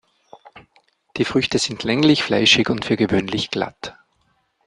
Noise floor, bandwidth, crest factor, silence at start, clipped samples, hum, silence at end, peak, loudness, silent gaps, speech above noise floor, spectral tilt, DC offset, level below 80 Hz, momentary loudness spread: -65 dBFS; 10.5 kHz; 20 dB; 0.35 s; under 0.1%; none; 0.75 s; -2 dBFS; -18 LUFS; none; 46 dB; -4 dB/octave; under 0.1%; -52 dBFS; 14 LU